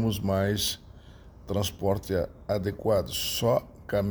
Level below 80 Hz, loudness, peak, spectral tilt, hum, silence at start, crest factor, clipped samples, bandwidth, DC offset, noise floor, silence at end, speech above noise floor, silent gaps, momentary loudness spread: -48 dBFS; -28 LUFS; -12 dBFS; -5 dB/octave; none; 0 s; 16 dB; under 0.1%; over 20 kHz; under 0.1%; -49 dBFS; 0 s; 21 dB; none; 5 LU